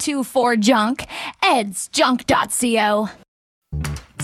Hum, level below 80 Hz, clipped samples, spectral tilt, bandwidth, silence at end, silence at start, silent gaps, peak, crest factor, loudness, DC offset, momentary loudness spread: none; -42 dBFS; under 0.1%; -3.5 dB/octave; 16 kHz; 0 s; 0 s; 3.28-3.62 s; -4 dBFS; 16 dB; -19 LUFS; under 0.1%; 12 LU